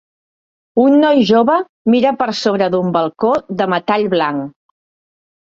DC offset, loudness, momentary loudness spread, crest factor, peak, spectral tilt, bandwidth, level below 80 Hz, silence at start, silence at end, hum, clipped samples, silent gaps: under 0.1%; -14 LUFS; 7 LU; 14 dB; -2 dBFS; -6.5 dB/octave; 7.6 kHz; -58 dBFS; 0.75 s; 1.1 s; none; under 0.1%; 1.69-1.85 s